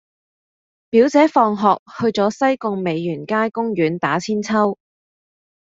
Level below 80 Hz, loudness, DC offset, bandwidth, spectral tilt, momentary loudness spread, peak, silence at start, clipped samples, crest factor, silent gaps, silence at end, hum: -62 dBFS; -18 LUFS; under 0.1%; 7.8 kHz; -6 dB/octave; 8 LU; -2 dBFS; 0.95 s; under 0.1%; 18 dB; 1.79-1.86 s; 0.95 s; none